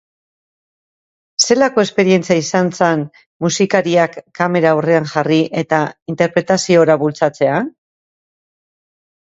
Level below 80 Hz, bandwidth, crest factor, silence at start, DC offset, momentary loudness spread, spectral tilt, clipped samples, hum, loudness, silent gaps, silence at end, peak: -60 dBFS; 8.2 kHz; 16 dB; 1.4 s; under 0.1%; 8 LU; -4.5 dB/octave; under 0.1%; none; -15 LUFS; 3.26-3.40 s, 6.02-6.06 s; 1.6 s; 0 dBFS